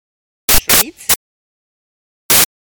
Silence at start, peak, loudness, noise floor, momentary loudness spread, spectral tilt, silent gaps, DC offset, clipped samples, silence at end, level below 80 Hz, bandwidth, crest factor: 0.5 s; 0 dBFS; -12 LUFS; under -90 dBFS; 7 LU; -0.5 dB/octave; 1.16-2.29 s; under 0.1%; 0.1%; 0.15 s; -32 dBFS; over 20 kHz; 16 dB